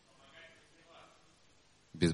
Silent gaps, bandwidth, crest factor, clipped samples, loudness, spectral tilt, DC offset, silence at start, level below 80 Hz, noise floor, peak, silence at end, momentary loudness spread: none; 10.5 kHz; 24 dB; under 0.1%; -41 LUFS; -6 dB/octave; under 0.1%; 1.95 s; -66 dBFS; -67 dBFS; -18 dBFS; 0 s; 13 LU